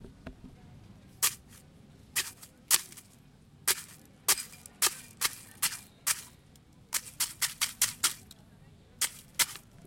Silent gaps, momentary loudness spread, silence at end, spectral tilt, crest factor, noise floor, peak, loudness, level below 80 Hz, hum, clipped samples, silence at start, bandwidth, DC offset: none; 21 LU; 0.3 s; 1 dB/octave; 30 dB; -58 dBFS; -6 dBFS; -31 LUFS; -64 dBFS; none; under 0.1%; 0 s; 17 kHz; under 0.1%